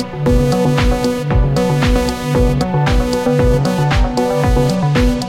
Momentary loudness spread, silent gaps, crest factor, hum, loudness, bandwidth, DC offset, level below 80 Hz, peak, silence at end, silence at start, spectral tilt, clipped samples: 2 LU; none; 10 dB; none; -15 LUFS; 16 kHz; under 0.1%; -20 dBFS; -2 dBFS; 0 s; 0 s; -6.5 dB/octave; under 0.1%